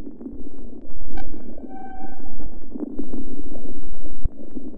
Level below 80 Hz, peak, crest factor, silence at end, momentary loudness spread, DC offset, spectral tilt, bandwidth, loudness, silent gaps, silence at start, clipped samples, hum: -34 dBFS; -6 dBFS; 8 dB; 0.05 s; 8 LU; under 0.1%; -11 dB/octave; 2.5 kHz; -37 LUFS; none; 0 s; under 0.1%; none